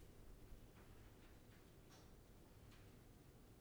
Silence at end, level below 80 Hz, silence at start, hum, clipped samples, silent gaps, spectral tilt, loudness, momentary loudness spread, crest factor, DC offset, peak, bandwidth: 0 s; -66 dBFS; 0 s; none; under 0.1%; none; -5 dB/octave; -66 LUFS; 2 LU; 16 dB; under 0.1%; -46 dBFS; over 20 kHz